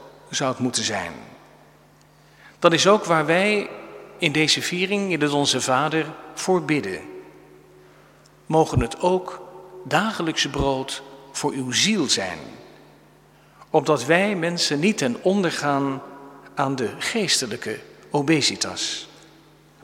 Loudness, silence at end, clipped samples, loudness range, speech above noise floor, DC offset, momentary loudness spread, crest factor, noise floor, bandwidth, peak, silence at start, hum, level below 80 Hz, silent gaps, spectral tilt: -22 LUFS; 0.75 s; under 0.1%; 4 LU; 31 dB; under 0.1%; 16 LU; 24 dB; -53 dBFS; 16.5 kHz; 0 dBFS; 0 s; none; -48 dBFS; none; -3.5 dB/octave